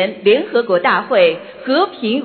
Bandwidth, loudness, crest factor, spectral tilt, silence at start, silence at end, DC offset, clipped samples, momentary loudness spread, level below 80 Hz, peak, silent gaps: 4.7 kHz; -15 LUFS; 14 dB; -10 dB/octave; 0 s; 0 s; under 0.1%; under 0.1%; 4 LU; -64 dBFS; -2 dBFS; none